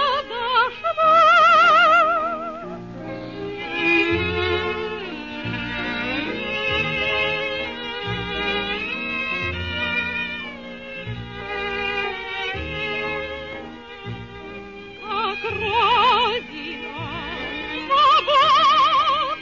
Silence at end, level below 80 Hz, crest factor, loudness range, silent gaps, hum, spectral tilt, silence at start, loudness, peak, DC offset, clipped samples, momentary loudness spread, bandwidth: 0 s; -48 dBFS; 14 dB; 10 LU; none; none; -4.5 dB/octave; 0 s; -20 LUFS; -6 dBFS; 0.2%; under 0.1%; 19 LU; 7.4 kHz